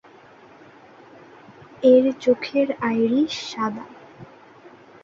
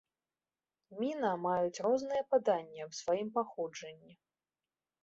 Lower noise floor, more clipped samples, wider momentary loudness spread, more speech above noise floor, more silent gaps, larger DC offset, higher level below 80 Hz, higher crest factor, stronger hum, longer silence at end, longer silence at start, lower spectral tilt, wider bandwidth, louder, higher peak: second, -48 dBFS vs under -90 dBFS; neither; about the same, 12 LU vs 12 LU; second, 29 dB vs over 55 dB; neither; neither; first, -66 dBFS vs -78 dBFS; about the same, 18 dB vs 18 dB; neither; second, 0.35 s vs 0.9 s; first, 1.8 s vs 0.9 s; about the same, -5.5 dB/octave vs -4.5 dB/octave; about the same, 7.6 kHz vs 7.6 kHz; first, -20 LUFS vs -35 LUFS; first, -4 dBFS vs -18 dBFS